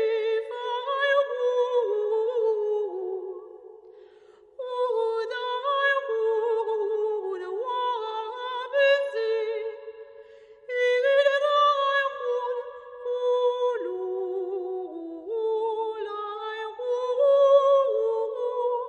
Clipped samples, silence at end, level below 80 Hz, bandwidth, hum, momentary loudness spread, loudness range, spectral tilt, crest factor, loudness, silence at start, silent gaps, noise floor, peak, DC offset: under 0.1%; 0 s; -78 dBFS; 7.2 kHz; none; 12 LU; 6 LU; -2 dB/octave; 16 dB; -26 LUFS; 0 s; none; -54 dBFS; -8 dBFS; under 0.1%